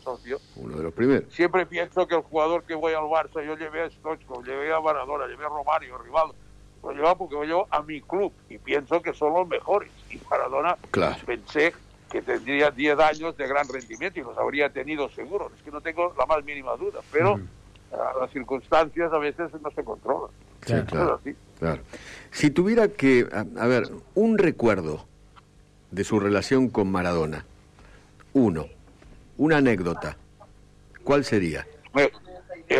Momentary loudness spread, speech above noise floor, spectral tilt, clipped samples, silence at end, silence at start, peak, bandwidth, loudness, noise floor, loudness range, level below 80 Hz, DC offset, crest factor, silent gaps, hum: 13 LU; 30 dB; -6 dB/octave; under 0.1%; 0 s; 0.05 s; -10 dBFS; 12 kHz; -25 LUFS; -55 dBFS; 4 LU; -52 dBFS; under 0.1%; 14 dB; none; 50 Hz at -55 dBFS